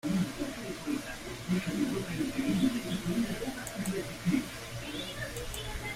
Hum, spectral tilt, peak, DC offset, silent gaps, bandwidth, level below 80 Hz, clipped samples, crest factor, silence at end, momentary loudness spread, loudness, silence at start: none; -5 dB/octave; -16 dBFS; under 0.1%; none; 16 kHz; -50 dBFS; under 0.1%; 16 dB; 0 s; 8 LU; -34 LUFS; 0.05 s